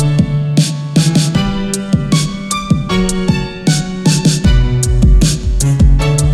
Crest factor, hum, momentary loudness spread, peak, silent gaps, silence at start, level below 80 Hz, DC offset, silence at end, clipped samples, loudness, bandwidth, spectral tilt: 12 dB; none; 5 LU; 0 dBFS; none; 0 s; -16 dBFS; under 0.1%; 0 s; under 0.1%; -13 LUFS; 13.5 kHz; -5.5 dB/octave